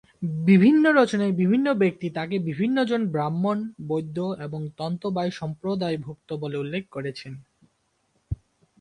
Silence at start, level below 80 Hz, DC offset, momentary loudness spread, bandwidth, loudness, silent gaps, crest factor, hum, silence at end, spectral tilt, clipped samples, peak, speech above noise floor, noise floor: 0.2 s; -52 dBFS; under 0.1%; 17 LU; 9.8 kHz; -24 LUFS; none; 18 dB; none; 0.45 s; -7.5 dB/octave; under 0.1%; -6 dBFS; 47 dB; -70 dBFS